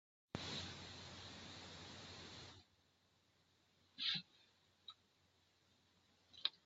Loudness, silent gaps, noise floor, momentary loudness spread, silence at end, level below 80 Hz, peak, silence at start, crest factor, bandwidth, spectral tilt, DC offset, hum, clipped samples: -48 LUFS; none; -78 dBFS; 23 LU; 0.05 s; -80 dBFS; -22 dBFS; 0.35 s; 32 dB; 8 kHz; -1.5 dB/octave; under 0.1%; none; under 0.1%